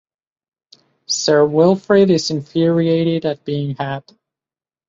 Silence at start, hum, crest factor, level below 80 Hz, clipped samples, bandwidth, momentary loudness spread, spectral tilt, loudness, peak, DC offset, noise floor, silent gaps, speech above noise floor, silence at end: 1.1 s; none; 16 dB; -60 dBFS; under 0.1%; 7.8 kHz; 10 LU; -5.5 dB/octave; -16 LUFS; -2 dBFS; under 0.1%; under -90 dBFS; none; over 74 dB; 0.9 s